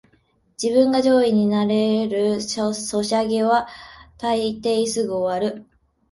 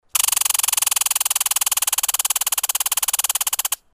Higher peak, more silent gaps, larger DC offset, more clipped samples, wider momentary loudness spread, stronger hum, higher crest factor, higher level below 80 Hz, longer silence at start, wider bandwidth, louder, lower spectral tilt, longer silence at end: about the same, -4 dBFS vs -2 dBFS; neither; neither; neither; first, 10 LU vs 3 LU; neither; about the same, 16 dB vs 20 dB; about the same, -58 dBFS vs -60 dBFS; first, 0.6 s vs 0.15 s; second, 11.5 kHz vs 16 kHz; second, -20 LUFS vs -17 LUFS; first, -5 dB/octave vs 5 dB/octave; first, 0.5 s vs 0.2 s